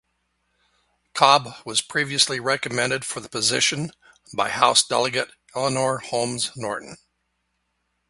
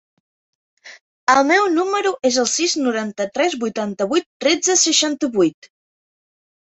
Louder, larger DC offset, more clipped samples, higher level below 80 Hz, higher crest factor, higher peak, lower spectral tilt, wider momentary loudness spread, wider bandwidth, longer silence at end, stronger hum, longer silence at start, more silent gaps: second, -21 LUFS vs -18 LUFS; neither; neither; about the same, -64 dBFS vs -66 dBFS; first, 24 dB vs 18 dB; about the same, 0 dBFS vs -2 dBFS; about the same, -2 dB/octave vs -1.5 dB/octave; first, 14 LU vs 9 LU; first, 11.5 kHz vs 8.2 kHz; about the same, 1.15 s vs 1.15 s; first, 60 Hz at -55 dBFS vs none; first, 1.15 s vs 0.85 s; second, none vs 1.01-1.27 s, 4.26-4.40 s